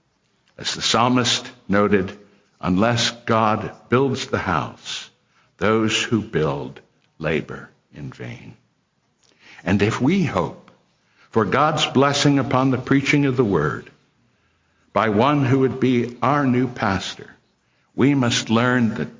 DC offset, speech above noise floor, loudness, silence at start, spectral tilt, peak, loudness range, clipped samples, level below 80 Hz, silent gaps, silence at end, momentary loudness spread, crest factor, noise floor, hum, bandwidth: under 0.1%; 47 dB; -20 LUFS; 0.6 s; -5 dB/octave; -4 dBFS; 6 LU; under 0.1%; -48 dBFS; none; 0.05 s; 14 LU; 18 dB; -67 dBFS; none; 7.6 kHz